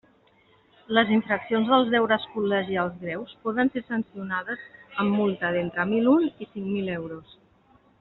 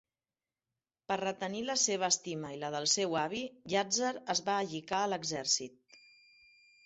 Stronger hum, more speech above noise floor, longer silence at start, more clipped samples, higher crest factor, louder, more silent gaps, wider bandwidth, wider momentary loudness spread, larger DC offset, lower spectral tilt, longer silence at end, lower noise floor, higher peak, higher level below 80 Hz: neither; second, 36 dB vs over 56 dB; second, 0.9 s vs 1.1 s; neither; about the same, 22 dB vs 22 dB; first, -25 LUFS vs -33 LUFS; neither; second, 4.1 kHz vs 8.6 kHz; first, 13 LU vs 8 LU; neither; first, -4 dB/octave vs -2 dB/octave; about the same, 0.8 s vs 0.9 s; second, -60 dBFS vs under -90 dBFS; first, -4 dBFS vs -14 dBFS; first, -64 dBFS vs -76 dBFS